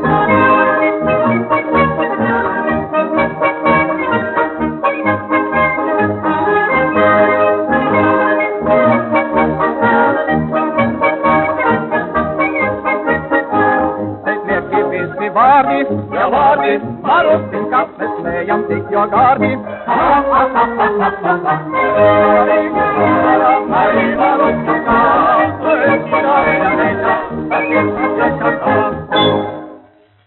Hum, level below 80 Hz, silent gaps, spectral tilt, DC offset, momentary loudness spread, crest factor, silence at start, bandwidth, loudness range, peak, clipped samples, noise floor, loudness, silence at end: none; -44 dBFS; none; -4 dB/octave; under 0.1%; 6 LU; 12 dB; 0 s; 4.2 kHz; 3 LU; 0 dBFS; under 0.1%; -45 dBFS; -13 LUFS; 0.5 s